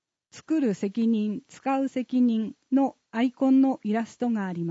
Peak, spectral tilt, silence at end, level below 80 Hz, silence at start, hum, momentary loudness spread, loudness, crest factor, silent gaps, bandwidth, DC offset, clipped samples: -14 dBFS; -7 dB/octave; 0 s; -78 dBFS; 0.35 s; none; 7 LU; -26 LUFS; 12 dB; none; 8 kHz; under 0.1%; under 0.1%